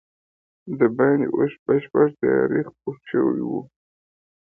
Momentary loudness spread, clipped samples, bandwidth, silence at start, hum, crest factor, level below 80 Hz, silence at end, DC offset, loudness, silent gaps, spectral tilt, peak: 12 LU; under 0.1%; 3.5 kHz; 0.65 s; none; 18 dB; -64 dBFS; 0.85 s; under 0.1%; -22 LUFS; 1.59-1.66 s; -11 dB/octave; -4 dBFS